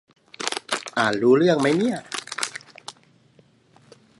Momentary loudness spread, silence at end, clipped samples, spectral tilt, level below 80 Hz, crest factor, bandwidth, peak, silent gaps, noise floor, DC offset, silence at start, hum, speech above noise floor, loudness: 21 LU; 1.3 s; under 0.1%; -4.5 dB/octave; -70 dBFS; 22 dB; 11.5 kHz; -2 dBFS; none; -57 dBFS; under 0.1%; 0.4 s; none; 38 dB; -22 LUFS